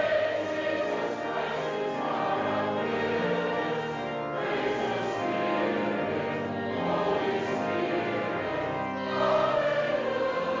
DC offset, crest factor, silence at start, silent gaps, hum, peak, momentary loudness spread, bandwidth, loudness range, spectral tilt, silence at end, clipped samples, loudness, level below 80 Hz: under 0.1%; 14 dB; 0 s; none; none; -14 dBFS; 5 LU; 7.6 kHz; 1 LU; -6 dB/octave; 0 s; under 0.1%; -29 LUFS; -62 dBFS